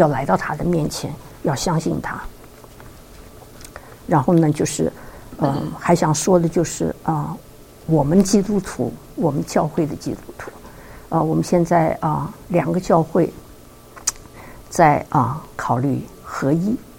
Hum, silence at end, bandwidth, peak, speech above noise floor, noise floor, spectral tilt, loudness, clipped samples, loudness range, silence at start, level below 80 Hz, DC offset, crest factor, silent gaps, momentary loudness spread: none; 0 s; 17 kHz; 0 dBFS; 24 dB; -43 dBFS; -6 dB/octave; -20 LUFS; under 0.1%; 4 LU; 0 s; -42 dBFS; under 0.1%; 20 dB; none; 20 LU